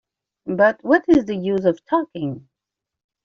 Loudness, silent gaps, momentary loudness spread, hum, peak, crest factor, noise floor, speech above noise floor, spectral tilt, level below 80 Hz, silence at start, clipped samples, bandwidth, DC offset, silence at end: -19 LUFS; none; 14 LU; none; -4 dBFS; 16 dB; -85 dBFS; 66 dB; -5.5 dB/octave; -54 dBFS; 0.45 s; under 0.1%; 7.2 kHz; under 0.1%; 0.85 s